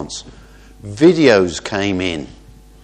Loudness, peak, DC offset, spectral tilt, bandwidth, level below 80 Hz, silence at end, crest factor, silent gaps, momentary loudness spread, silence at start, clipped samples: -15 LUFS; 0 dBFS; under 0.1%; -5 dB/octave; 9.8 kHz; -44 dBFS; 0.55 s; 18 dB; none; 22 LU; 0 s; under 0.1%